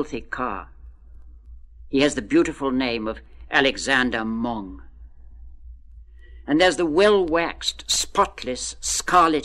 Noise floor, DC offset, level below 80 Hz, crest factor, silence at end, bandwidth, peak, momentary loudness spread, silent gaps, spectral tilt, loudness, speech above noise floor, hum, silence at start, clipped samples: -44 dBFS; under 0.1%; -44 dBFS; 20 dB; 0 s; 15.5 kHz; -4 dBFS; 12 LU; none; -3 dB/octave; -21 LUFS; 22 dB; none; 0 s; under 0.1%